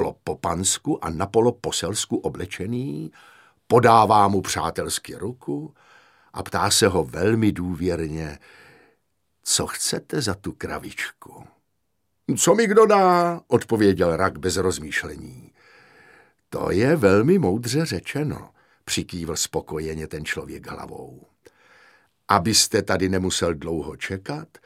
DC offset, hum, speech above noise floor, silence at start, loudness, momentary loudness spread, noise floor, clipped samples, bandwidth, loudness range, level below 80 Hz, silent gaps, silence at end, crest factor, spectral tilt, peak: under 0.1%; none; 54 dB; 0 s; -22 LUFS; 17 LU; -76 dBFS; under 0.1%; 16 kHz; 8 LU; -50 dBFS; none; 0.2 s; 22 dB; -4 dB/octave; -2 dBFS